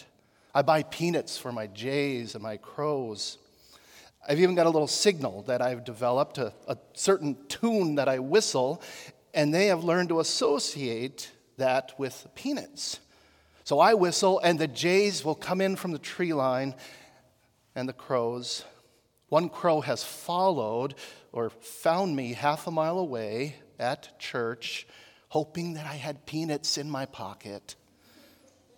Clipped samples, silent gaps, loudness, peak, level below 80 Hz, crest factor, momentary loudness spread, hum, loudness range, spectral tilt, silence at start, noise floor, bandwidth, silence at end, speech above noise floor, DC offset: under 0.1%; none; -28 LUFS; -8 dBFS; -74 dBFS; 22 dB; 14 LU; none; 7 LU; -4.5 dB/octave; 0 s; -66 dBFS; 18 kHz; 1.05 s; 38 dB; under 0.1%